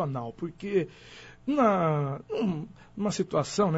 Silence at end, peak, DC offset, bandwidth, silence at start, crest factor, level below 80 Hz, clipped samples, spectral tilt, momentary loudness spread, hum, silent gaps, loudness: 0 s; -10 dBFS; under 0.1%; 8 kHz; 0 s; 18 dB; -60 dBFS; under 0.1%; -6.5 dB/octave; 15 LU; none; none; -29 LUFS